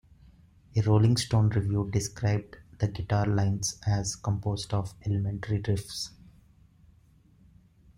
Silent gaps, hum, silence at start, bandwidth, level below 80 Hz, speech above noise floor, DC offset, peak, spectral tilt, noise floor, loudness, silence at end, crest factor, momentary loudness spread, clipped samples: none; none; 0.75 s; 15 kHz; -52 dBFS; 33 dB; under 0.1%; -12 dBFS; -5.5 dB/octave; -60 dBFS; -29 LUFS; 1.9 s; 16 dB; 9 LU; under 0.1%